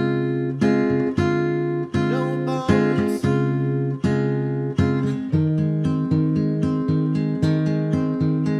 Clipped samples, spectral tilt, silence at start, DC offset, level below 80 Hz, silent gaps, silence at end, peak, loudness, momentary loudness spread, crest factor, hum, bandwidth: under 0.1%; -8.5 dB/octave; 0 s; under 0.1%; -48 dBFS; none; 0 s; -6 dBFS; -21 LUFS; 4 LU; 16 dB; none; 11 kHz